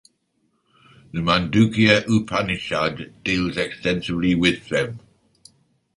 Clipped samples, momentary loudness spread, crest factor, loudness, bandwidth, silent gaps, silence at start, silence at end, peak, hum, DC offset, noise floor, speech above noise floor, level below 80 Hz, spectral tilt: under 0.1%; 10 LU; 20 dB; -21 LUFS; 11.5 kHz; none; 1.15 s; 1 s; -2 dBFS; none; under 0.1%; -69 dBFS; 48 dB; -46 dBFS; -5.5 dB/octave